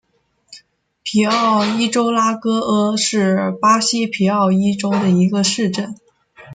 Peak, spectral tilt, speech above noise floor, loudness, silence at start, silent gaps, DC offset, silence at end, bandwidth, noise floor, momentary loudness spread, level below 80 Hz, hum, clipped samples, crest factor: -2 dBFS; -4.5 dB/octave; 37 dB; -16 LUFS; 0.5 s; none; under 0.1%; 0 s; 9.4 kHz; -53 dBFS; 5 LU; -60 dBFS; none; under 0.1%; 16 dB